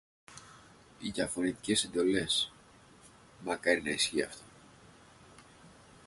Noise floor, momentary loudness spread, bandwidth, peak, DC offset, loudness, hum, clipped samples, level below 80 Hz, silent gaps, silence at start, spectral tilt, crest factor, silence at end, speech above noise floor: -59 dBFS; 22 LU; 11.5 kHz; -14 dBFS; under 0.1%; -32 LUFS; none; under 0.1%; -64 dBFS; none; 0.3 s; -2.5 dB/octave; 22 dB; 0.4 s; 27 dB